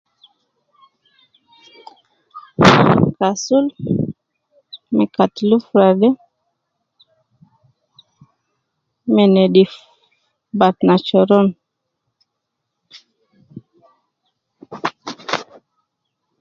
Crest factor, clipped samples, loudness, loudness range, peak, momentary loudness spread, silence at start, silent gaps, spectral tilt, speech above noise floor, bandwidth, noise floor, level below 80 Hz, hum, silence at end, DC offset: 18 dB; under 0.1%; -15 LUFS; 15 LU; 0 dBFS; 16 LU; 2.35 s; none; -6.5 dB/octave; 63 dB; 7.6 kHz; -77 dBFS; -52 dBFS; none; 1 s; under 0.1%